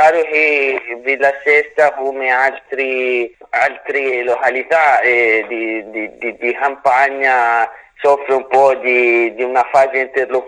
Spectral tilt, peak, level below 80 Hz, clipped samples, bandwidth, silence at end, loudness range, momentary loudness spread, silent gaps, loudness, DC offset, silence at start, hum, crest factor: -4 dB/octave; 0 dBFS; -62 dBFS; under 0.1%; 10 kHz; 0 s; 2 LU; 8 LU; none; -14 LUFS; under 0.1%; 0 s; none; 14 dB